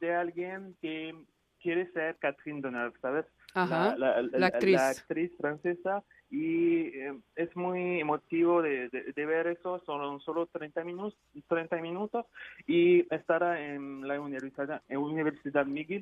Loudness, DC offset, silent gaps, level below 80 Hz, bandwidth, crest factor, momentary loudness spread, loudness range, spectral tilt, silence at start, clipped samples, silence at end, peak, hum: -32 LUFS; under 0.1%; none; -76 dBFS; 12.5 kHz; 20 dB; 12 LU; 5 LU; -6 dB/octave; 0 s; under 0.1%; 0 s; -12 dBFS; none